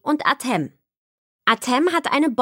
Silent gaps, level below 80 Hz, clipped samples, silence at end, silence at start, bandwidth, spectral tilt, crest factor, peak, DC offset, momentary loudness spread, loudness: 0.97-1.39 s; -72 dBFS; under 0.1%; 0 s; 0.05 s; 16.5 kHz; -4 dB/octave; 20 dB; -2 dBFS; under 0.1%; 6 LU; -20 LUFS